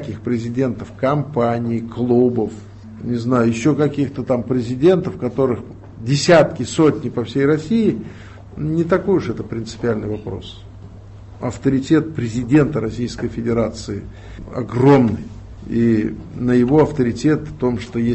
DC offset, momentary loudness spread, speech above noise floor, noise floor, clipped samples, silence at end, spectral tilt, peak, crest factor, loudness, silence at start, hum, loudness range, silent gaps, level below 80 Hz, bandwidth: under 0.1%; 16 LU; 20 dB; -37 dBFS; under 0.1%; 0 s; -7 dB/octave; -2 dBFS; 16 dB; -18 LUFS; 0 s; none; 5 LU; none; -42 dBFS; 8.6 kHz